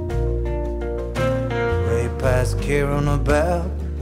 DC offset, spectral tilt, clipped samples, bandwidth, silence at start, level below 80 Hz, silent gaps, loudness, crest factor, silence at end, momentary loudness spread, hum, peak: under 0.1%; -7 dB/octave; under 0.1%; 15 kHz; 0 s; -26 dBFS; none; -22 LUFS; 16 dB; 0 s; 7 LU; none; -6 dBFS